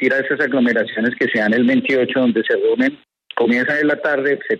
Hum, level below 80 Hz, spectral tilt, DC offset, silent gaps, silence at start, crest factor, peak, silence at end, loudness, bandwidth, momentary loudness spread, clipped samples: none; -64 dBFS; -6.5 dB/octave; under 0.1%; none; 0 s; 12 dB; -4 dBFS; 0 s; -17 LUFS; 7.2 kHz; 4 LU; under 0.1%